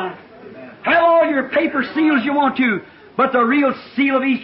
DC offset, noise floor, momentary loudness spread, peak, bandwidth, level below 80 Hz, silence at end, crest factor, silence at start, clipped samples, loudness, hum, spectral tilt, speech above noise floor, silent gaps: under 0.1%; -38 dBFS; 12 LU; -6 dBFS; 5.8 kHz; -60 dBFS; 0 s; 12 dB; 0 s; under 0.1%; -17 LUFS; none; -10 dB/octave; 21 dB; none